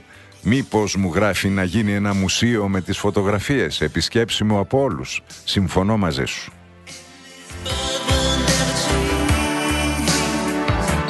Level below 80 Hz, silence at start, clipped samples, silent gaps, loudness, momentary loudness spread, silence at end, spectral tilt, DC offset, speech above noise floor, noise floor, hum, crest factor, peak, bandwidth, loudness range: -32 dBFS; 0.1 s; under 0.1%; none; -20 LUFS; 9 LU; 0 s; -4.5 dB/octave; under 0.1%; 22 dB; -41 dBFS; none; 16 dB; -4 dBFS; 12.5 kHz; 3 LU